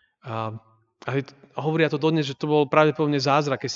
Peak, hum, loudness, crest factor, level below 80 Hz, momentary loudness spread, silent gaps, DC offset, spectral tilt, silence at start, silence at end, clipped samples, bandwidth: -2 dBFS; none; -23 LUFS; 22 dB; -72 dBFS; 15 LU; none; under 0.1%; -6 dB/octave; 0.25 s; 0 s; under 0.1%; 7.6 kHz